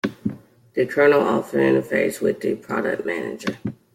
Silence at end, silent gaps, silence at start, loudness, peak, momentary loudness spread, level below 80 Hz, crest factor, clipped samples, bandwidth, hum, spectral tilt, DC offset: 0.2 s; none; 0.05 s; -21 LUFS; -6 dBFS; 13 LU; -62 dBFS; 16 dB; under 0.1%; 16 kHz; none; -6 dB/octave; under 0.1%